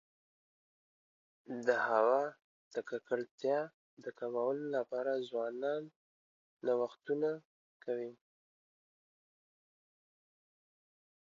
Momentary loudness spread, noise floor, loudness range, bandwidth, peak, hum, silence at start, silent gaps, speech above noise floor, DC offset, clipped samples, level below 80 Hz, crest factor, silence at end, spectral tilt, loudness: 15 LU; under -90 dBFS; 9 LU; 7.4 kHz; -16 dBFS; none; 1.5 s; 2.44-2.71 s, 3.31-3.38 s, 3.74-3.97 s, 5.96-6.57 s, 7.45-7.80 s; over 54 dB; under 0.1%; under 0.1%; under -90 dBFS; 24 dB; 3.2 s; -3.5 dB/octave; -37 LUFS